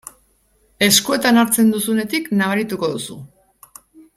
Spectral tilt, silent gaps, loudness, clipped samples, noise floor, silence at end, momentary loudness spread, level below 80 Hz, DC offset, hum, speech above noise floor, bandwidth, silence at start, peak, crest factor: -3 dB/octave; none; -16 LUFS; under 0.1%; -59 dBFS; 0.15 s; 12 LU; -58 dBFS; under 0.1%; none; 42 dB; 16 kHz; 0.8 s; 0 dBFS; 20 dB